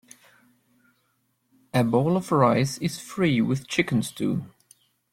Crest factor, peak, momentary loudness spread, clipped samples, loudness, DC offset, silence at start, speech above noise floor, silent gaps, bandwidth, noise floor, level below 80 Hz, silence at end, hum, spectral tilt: 20 dB; -6 dBFS; 8 LU; under 0.1%; -24 LUFS; under 0.1%; 1.75 s; 48 dB; none; 16 kHz; -71 dBFS; -60 dBFS; 0.65 s; none; -6 dB/octave